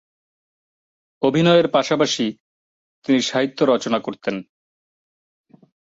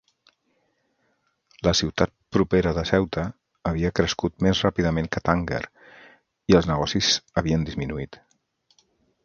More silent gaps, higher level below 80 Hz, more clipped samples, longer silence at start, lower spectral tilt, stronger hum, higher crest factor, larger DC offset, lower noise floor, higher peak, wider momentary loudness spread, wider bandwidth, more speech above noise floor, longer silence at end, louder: first, 2.40-3.02 s vs none; second, -64 dBFS vs -40 dBFS; neither; second, 1.2 s vs 1.65 s; about the same, -5 dB/octave vs -5 dB/octave; neither; about the same, 18 dB vs 22 dB; neither; first, under -90 dBFS vs -70 dBFS; about the same, -4 dBFS vs -2 dBFS; about the same, 12 LU vs 11 LU; about the same, 7.8 kHz vs 7.4 kHz; first, over 72 dB vs 47 dB; first, 1.45 s vs 1.1 s; first, -19 LUFS vs -24 LUFS